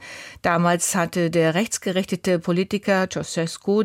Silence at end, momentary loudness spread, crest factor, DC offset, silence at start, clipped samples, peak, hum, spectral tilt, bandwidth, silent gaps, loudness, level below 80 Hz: 0 s; 6 LU; 16 dB; under 0.1%; 0 s; under 0.1%; -6 dBFS; none; -4.5 dB/octave; 16.5 kHz; none; -22 LUFS; -56 dBFS